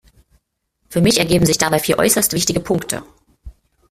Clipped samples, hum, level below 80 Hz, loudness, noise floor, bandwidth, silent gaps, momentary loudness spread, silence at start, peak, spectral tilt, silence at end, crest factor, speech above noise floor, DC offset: under 0.1%; none; -42 dBFS; -16 LUFS; -68 dBFS; 16 kHz; none; 10 LU; 0.9 s; 0 dBFS; -4 dB/octave; 0.4 s; 18 dB; 52 dB; under 0.1%